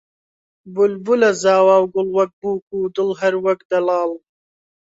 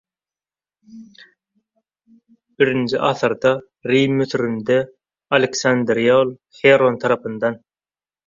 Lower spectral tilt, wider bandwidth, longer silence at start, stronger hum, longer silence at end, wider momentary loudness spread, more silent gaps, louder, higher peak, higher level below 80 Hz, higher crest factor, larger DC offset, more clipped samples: about the same, -5 dB/octave vs -5 dB/octave; about the same, 8 kHz vs 7.6 kHz; second, 0.65 s vs 0.95 s; neither; about the same, 0.8 s vs 0.7 s; about the same, 10 LU vs 9 LU; first, 2.33-2.42 s, 2.62-2.67 s, 3.65-3.70 s vs none; about the same, -17 LUFS vs -18 LUFS; about the same, -2 dBFS vs -2 dBFS; about the same, -64 dBFS vs -62 dBFS; about the same, 16 dB vs 18 dB; neither; neither